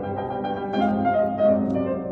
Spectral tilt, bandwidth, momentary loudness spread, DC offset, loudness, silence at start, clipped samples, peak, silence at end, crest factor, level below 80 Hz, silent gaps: -9 dB/octave; 6 kHz; 8 LU; under 0.1%; -23 LUFS; 0 s; under 0.1%; -10 dBFS; 0 s; 14 dB; -52 dBFS; none